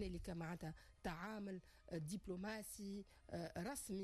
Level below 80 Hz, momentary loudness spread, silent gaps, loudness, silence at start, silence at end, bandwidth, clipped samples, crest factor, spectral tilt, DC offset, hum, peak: -64 dBFS; 5 LU; none; -50 LUFS; 0 s; 0 s; 13.5 kHz; under 0.1%; 12 dB; -5 dB/octave; under 0.1%; none; -36 dBFS